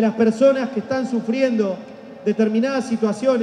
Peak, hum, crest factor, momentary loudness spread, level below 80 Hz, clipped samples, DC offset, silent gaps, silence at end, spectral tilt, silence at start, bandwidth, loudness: -4 dBFS; none; 16 dB; 8 LU; -68 dBFS; under 0.1%; under 0.1%; none; 0 s; -6.5 dB/octave; 0 s; 10 kHz; -20 LUFS